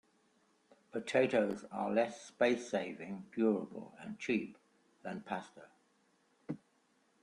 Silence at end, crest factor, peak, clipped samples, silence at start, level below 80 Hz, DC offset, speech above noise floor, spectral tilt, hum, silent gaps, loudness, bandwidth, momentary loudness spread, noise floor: 0.65 s; 20 dB; -18 dBFS; under 0.1%; 0.95 s; -80 dBFS; under 0.1%; 38 dB; -5.5 dB/octave; none; none; -36 LUFS; 11 kHz; 16 LU; -74 dBFS